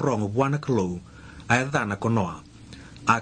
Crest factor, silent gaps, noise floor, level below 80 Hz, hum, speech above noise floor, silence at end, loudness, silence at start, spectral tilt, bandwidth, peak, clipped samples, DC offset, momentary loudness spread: 20 dB; none; -44 dBFS; -52 dBFS; none; 20 dB; 0 s; -25 LUFS; 0 s; -6 dB/octave; 9.8 kHz; -4 dBFS; under 0.1%; under 0.1%; 21 LU